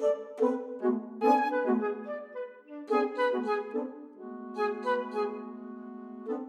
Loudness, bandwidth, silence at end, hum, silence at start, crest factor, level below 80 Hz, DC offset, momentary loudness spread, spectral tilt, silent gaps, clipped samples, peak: -31 LUFS; 12 kHz; 0 s; none; 0 s; 20 dB; under -90 dBFS; under 0.1%; 17 LU; -6 dB/octave; none; under 0.1%; -12 dBFS